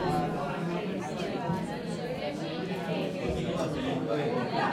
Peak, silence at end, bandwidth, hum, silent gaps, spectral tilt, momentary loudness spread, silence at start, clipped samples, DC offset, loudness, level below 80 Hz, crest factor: -16 dBFS; 0 s; 15 kHz; none; none; -6.5 dB/octave; 4 LU; 0 s; under 0.1%; under 0.1%; -32 LUFS; -54 dBFS; 14 dB